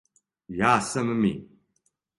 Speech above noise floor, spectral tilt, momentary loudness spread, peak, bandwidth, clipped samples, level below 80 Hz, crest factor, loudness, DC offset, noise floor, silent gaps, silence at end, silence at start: 49 dB; -5 dB/octave; 14 LU; -6 dBFS; 11.5 kHz; under 0.1%; -56 dBFS; 22 dB; -24 LUFS; under 0.1%; -73 dBFS; none; 0.75 s; 0.5 s